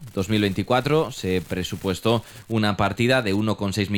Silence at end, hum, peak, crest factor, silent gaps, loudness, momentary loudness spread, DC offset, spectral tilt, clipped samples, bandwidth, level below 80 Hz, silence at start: 0 s; none; -6 dBFS; 16 dB; none; -23 LUFS; 6 LU; under 0.1%; -5.5 dB/octave; under 0.1%; 19.5 kHz; -48 dBFS; 0 s